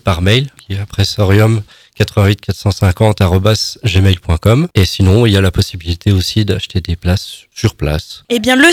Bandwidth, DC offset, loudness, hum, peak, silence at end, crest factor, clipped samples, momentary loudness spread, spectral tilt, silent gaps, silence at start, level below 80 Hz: 15.5 kHz; under 0.1%; -13 LUFS; none; 0 dBFS; 0 s; 12 dB; 0.2%; 8 LU; -5.5 dB/octave; none; 0.05 s; -28 dBFS